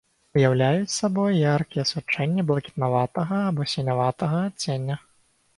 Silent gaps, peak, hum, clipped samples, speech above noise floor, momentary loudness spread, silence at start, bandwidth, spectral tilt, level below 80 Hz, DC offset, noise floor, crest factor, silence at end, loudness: none; -6 dBFS; none; under 0.1%; 40 dB; 6 LU; 0.35 s; 11.5 kHz; -6 dB/octave; -60 dBFS; under 0.1%; -63 dBFS; 18 dB; 0.6 s; -24 LUFS